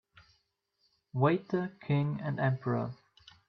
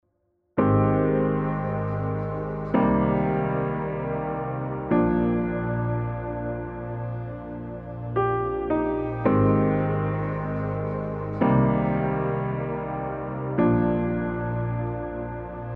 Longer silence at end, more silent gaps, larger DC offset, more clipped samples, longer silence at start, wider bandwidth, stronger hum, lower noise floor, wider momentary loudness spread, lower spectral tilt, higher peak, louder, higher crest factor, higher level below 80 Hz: first, 0.55 s vs 0 s; neither; neither; neither; first, 1.15 s vs 0.55 s; first, 5.8 kHz vs 4.2 kHz; neither; first, -77 dBFS vs -71 dBFS; about the same, 12 LU vs 11 LU; second, -10 dB/octave vs -12 dB/octave; second, -14 dBFS vs -8 dBFS; second, -32 LUFS vs -25 LUFS; about the same, 20 dB vs 18 dB; second, -70 dBFS vs -42 dBFS